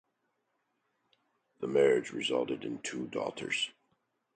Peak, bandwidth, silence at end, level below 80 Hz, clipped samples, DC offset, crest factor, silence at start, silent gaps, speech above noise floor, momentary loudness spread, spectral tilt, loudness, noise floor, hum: -14 dBFS; 9.4 kHz; 0.65 s; -76 dBFS; under 0.1%; under 0.1%; 20 dB; 1.6 s; none; 48 dB; 11 LU; -3.5 dB/octave; -32 LUFS; -80 dBFS; none